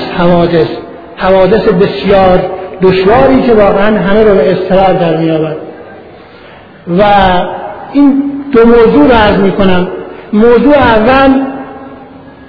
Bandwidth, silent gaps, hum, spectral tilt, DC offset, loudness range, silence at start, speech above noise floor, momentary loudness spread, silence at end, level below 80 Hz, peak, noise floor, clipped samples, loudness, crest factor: 5.4 kHz; none; none; -9 dB/octave; under 0.1%; 4 LU; 0 s; 27 dB; 13 LU; 0 s; -28 dBFS; 0 dBFS; -33 dBFS; 2%; -7 LUFS; 8 dB